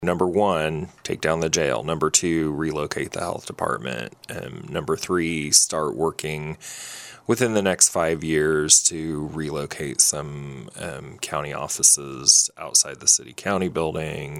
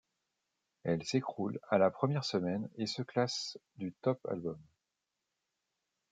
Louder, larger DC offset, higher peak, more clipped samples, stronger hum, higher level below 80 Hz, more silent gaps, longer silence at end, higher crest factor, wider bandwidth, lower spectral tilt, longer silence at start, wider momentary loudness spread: first, -21 LUFS vs -35 LUFS; neither; first, -2 dBFS vs -16 dBFS; neither; neither; first, -50 dBFS vs -78 dBFS; neither; second, 0 s vs 1.5 s; about the same, 22 dB vs 22 dB; first, 19 kHz vs 9.4 kHz; second, -2.5 dB/octave vs -5.5 dB/octave; second, 0 s vs 0.85 s; first, 18 LU vs 13 LU